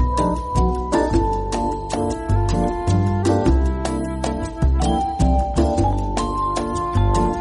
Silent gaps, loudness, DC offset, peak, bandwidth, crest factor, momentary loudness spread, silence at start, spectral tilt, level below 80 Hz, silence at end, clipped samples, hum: none; -20 LUFS; under 0.1%; -6 dBFS; 11.5 kHz; 12 dB; 5 LU; 0 s; -7 dB/octave; -24 dBFS; 0 s; under 0.1%; none